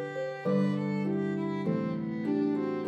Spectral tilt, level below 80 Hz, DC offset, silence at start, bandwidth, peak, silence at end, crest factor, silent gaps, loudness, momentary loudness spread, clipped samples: -9 dB/octave; -80 dBFS; under 0.1%; 0 s; 8 kHz; -18 dBFS; 0 s; 12 dB; none; -31 LUFS; 5 LU; under 0.1%